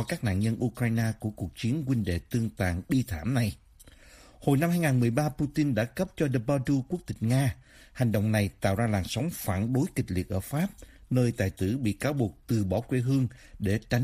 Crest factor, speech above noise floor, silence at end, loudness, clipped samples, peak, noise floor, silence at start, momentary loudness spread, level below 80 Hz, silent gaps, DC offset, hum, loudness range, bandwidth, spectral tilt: 18 dB; 26 dB; 0 s; -29 LUFS; under 0.1%; -10 dBFS; -54 dBFS; 0 s; 6 LU; -50 dBFS; none; under 0.1%; none; 2 LU; 15.5 kHz; -7 dB/octave